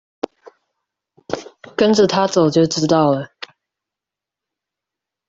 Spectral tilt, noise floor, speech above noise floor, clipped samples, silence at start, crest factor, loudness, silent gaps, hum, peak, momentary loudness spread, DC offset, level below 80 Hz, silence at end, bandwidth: -5.5 dB/octave; -86 dBFS; 72 dB; under 0.1%; 1.3 s; 18 dB; -16 LUFS; none; none; -2 dBFS; 17 LU; under 0.1%; -58 dBFS; 2.05 s; 7.8 kHz